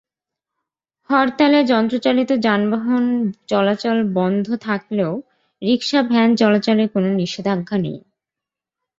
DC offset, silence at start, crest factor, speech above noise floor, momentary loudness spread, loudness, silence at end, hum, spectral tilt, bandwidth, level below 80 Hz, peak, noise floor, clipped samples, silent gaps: under 0.1%; 1.1 s; 16 dB; 69 dB; 8 LU; -18 LUFS; 1 s; none; -6.5 dB/octave; 7.6 kHz; -62 dBFS; -2 dBFS; -86 dBFS; under 0.1%; none